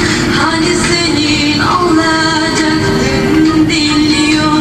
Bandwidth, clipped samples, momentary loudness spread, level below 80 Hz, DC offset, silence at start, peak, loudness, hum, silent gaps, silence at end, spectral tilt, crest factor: 13.5 kHz; under 0.1%; 2 LU; -30 dBFS; under 0.1%; 0 s; 0 dBFS; -10 LUFS; none; none; 0 s; -4 dB/octave; 10 dB